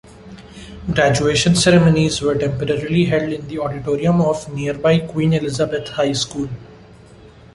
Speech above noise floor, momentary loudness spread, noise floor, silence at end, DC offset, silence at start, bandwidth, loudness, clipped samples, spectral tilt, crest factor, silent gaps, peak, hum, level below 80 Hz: 26 dB; 13 LU; -43 dBFS; 0.25 s; under 0.1%; 0.1 s; 11.5 kHz; -17 LUFS; under 0.1%; -5.5 dB/octave; 16 dB; none; -2 dBFS; none; -42 dBFS